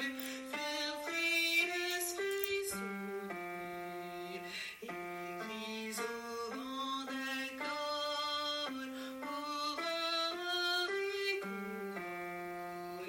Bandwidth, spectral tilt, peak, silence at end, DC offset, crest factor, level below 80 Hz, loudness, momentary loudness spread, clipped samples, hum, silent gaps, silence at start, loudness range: 16.5 kHz; -2 dB/octave; -18 dBFS; 0 s; under 0.1%; 22 dB; -76 dBFS; -38 LUFS; 10 LU; under 0.1%; none; none; 0 s; 7 LU